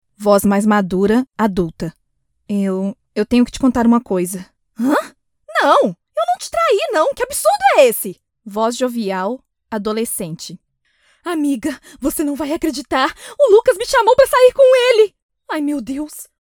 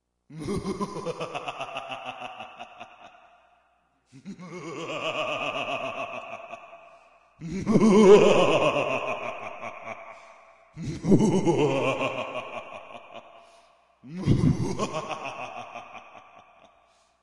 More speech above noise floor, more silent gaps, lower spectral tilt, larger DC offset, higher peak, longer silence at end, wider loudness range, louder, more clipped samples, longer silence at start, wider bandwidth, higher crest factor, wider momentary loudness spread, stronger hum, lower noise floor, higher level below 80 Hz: first, 53 dB vs 47 dB; first, 15.22-15.29 s vs none; second, -4.5 dB/octave vs -6 dB/octave; neither; first, 0 dBFS vs -4 dBFS; second, 0.15 s vs 1.05 s; second, 9 LU vs 15 LU; first, -16 LUFS vs -25 LUFS; neither; about the same, 0.2 s vs 0.3 s; first, over 20 kHz vs 11.5 kHz; second, 16 dB vs 22 dB; second, 14 LU vs 23 LU; neither; about the same, -68 dBFS vs -67 dBFS; first, -46 dBFS vs -52 dBFS